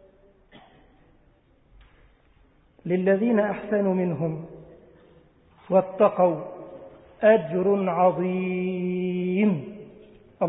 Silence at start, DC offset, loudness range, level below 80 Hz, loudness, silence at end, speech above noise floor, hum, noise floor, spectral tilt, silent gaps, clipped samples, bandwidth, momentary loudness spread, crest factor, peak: 2.85 s; under 0.1%; 5 LU; -62 dBFS; -23 LUFS; 0 s; 37 dB; none; -60 dBFS; -12 dB/octave; none; under 0.1%; 3.9 kHz; 19 LU; 20 dB; -6 dBFS